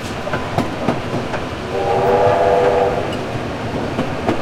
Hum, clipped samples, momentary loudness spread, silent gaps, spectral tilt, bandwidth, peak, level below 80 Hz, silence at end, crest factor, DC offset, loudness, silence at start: none; under 0.1%; 9 LU; none; -6 dB/octave; 16 kHz; -2 dBFS; -40 dBFS; 0 s; 16 dB; under 0.1%; -18 LUFS; 0 s